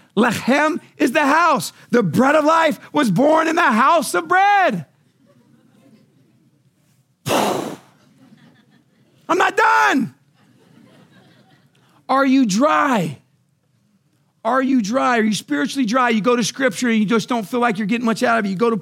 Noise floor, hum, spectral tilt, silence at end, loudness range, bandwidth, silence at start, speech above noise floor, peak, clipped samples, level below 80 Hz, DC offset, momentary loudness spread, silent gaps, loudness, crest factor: -62 dBFS; none; -4.5 dB/octave; 0 s; 11 LU; 16.5 kHz; 0.15 s; 45 dB; -2 dBFS; under 0.1%; -72 dBFS; under 0.1%; 7 LU; none; -17 LUFS; 16 dB